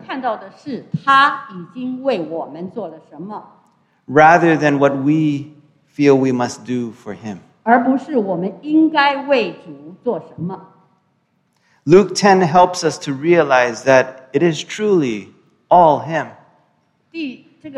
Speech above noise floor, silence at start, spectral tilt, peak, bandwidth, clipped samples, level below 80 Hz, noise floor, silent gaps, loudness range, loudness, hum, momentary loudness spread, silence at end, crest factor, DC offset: 48 dB; 0.1 s; -5.5 dB/octave; 0 dBFS; 11 kHz; under 0.1%; -60 dBFS; -63 dBFS; none; 5 LU; -15 LUFS; none; 18 LU; 0 s; 16 dB; under 0.1%